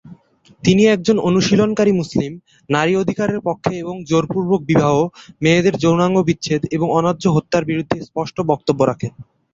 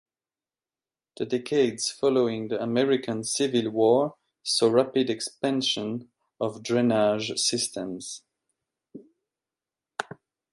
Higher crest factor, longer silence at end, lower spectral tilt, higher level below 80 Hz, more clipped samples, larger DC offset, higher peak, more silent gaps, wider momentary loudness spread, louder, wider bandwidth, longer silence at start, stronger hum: about the same, 16 dB vs 20 dB; second, 0.3 s vs 0.5 s; first, -6 dB/octave vs -4 dB/octave; first, -50 dBFS vs -72 dBFS; neither; neither; first, 0 dBFS vs -8 dBFS; neither; second, 8 LU vs 15 LU; first, -17 LUFS vs -25 LUFS; second, 7.8 kHz vs 11.5 kHz; second, 0.05 s vs 1.15 s; neither